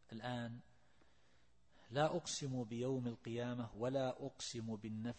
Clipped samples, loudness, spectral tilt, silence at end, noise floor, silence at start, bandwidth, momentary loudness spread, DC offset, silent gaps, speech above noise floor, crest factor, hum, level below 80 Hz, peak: under 0.1%; -43 LUFS; -5 dB/octave; 0 s; -75 dBFS; 0.1 s; 8.4 kHz; 8 LU; under 0.1%; none; 32 dB; 22 dB; none; -74 dBFS; -22 dBFS